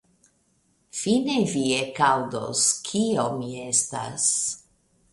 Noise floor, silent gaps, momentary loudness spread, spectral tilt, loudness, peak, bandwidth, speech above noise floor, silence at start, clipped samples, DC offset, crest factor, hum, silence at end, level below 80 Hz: -67 dBFS; none; 8 LU; -3 dB/octave; -23 LUFS; -6 dBFS; 11.5 kHz; 42 dB; 0.95 s; under 0.1%; under 0.1%; 20 dB; none; 0.55 s; -64 dBFS